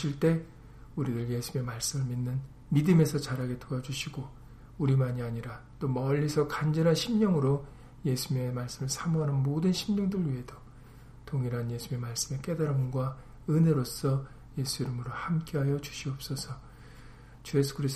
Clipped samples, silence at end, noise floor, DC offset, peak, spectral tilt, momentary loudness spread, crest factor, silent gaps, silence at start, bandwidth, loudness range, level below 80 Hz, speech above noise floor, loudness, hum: under 0.1%; 0 s; -50 dBFS; under 0.1%; -12 dBFS; -6 dB/octave; 12 LU; 18 dB; none; 0 s; 15 kHz; 4 LU; -52 dBFS; 21 dB; -31 LUFS; none